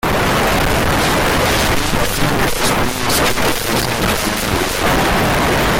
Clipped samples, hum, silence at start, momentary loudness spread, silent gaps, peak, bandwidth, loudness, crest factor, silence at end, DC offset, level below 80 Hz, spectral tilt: under 0.1%; none; 0.05 s; 3 LU; none; -4 dBFS; 17 kHz; -15 LUFS; 12 dB; 0 s; under 0.1%; -26 dBFS; -3.5 dB/octave